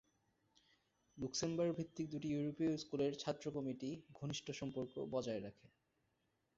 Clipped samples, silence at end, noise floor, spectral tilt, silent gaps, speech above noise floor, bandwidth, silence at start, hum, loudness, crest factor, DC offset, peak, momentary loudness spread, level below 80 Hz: under 0.1%; 1.05 s; -84 dBFS; -6 dB/octave; none; 41 dB; 7.6 kHz; 1.15 s; none; -43 LUFS; 18 dB; under 0.1%; -26 dBFS; 8 LU; -74 dBFS